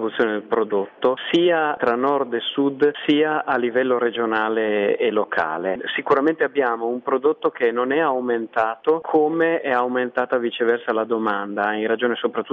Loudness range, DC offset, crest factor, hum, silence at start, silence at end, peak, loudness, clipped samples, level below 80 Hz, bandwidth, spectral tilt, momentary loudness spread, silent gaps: 1 LU; under 0.1%; 14 dB; none; 0 s; 0 s; -6 dBFS; -21 LUFS; under 0.1%; -68 dBFS; 6.6 kHz; -6.5 dB/octave; 4 LU; none